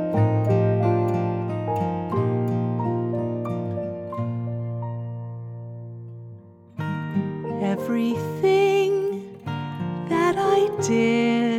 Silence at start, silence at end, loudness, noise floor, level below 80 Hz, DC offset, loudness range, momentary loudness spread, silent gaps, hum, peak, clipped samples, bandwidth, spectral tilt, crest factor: 0 s; 0 s; -24 LUFS; -44 dBFS; -60 dBFS; under 0.1%; 9 LU; 15 LU; none; none; -8 dBFS; under 0.1%; 13.5 kHz; -7 dB/octave; 14 dB